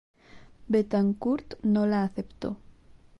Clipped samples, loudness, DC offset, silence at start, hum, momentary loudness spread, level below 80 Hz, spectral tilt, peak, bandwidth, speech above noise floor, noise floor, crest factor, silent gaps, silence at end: under 0.1%; -28 LUFS; under 0.1%; 0.35 s; none; 12 LU; -56 dBFS; -9 dB/octave; -12 dBFS; 6 kHz; 28 dB; -54 dBFS; 16 dB; none; 0.65 s